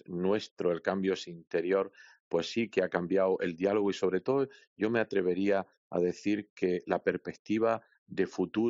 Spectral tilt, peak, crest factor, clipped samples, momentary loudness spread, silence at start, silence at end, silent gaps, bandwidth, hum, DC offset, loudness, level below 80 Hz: -5 dB/octave; -14 dBFS; 18 dB; under 0.1%; 6 LU; 0.1 s; 0 s; 0.51-0.56 s, 1.47-1.51 s, 2.20-2.31 s, 4.67-4.76 s, 5.77-5.90 s, 6.50-6.56 s, 7.39-7.45 s, 7.98-8.06 s; 7.6 kHz; none; under 0.1%; -31 LUFS; -74 dBFS